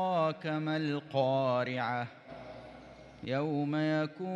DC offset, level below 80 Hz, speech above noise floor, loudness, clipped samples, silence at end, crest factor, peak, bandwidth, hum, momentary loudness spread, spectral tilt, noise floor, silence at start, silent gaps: under 0.1%; -70 dBFS; 19 dB; -33 LUFS; under 0.1%; 0 s; 16 dB; -16 dBFS; 7.6 kHz; none; 19 LU; -7.5 dB/octave; -52 dBFS; 0 s; none